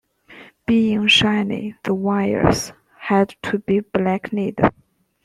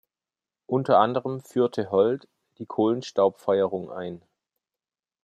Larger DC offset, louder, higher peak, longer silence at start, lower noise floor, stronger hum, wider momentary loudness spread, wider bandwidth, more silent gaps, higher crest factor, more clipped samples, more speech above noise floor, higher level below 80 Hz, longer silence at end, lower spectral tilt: neither; first, -19 LUFS vs -25 LUFS; first, 0 dBFS vs -6 dBFS; second, 0.3 s vs 0.7 s; second, -45 dBFS vs under -90 dBFS; neither; second, 11 LU vs 15 LU; about the same, 13.5 kHz vs 12.5 kHz; neither; about the same, 20 dB vs 20 dB; neither; second, 27 dB vs over 66 dB; first, -46 dBFS vs -74 dBFS; second, 0.55 s vs 1.05 s; second, -5 dB/octave vs -7 dB/octave